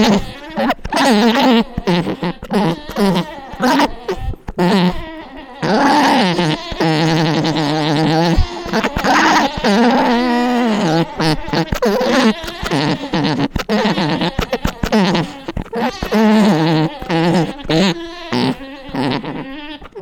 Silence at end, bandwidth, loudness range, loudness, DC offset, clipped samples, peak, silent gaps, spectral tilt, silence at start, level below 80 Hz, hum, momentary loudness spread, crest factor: 0 s; 18.5 kHz; 3 LU; -15 LUFS; under 0.1%; under 0.1%; -2 dBFS; none; -5.5 dB/octave; 0 s; -32 dBFS; none; 12 LU; 14 dB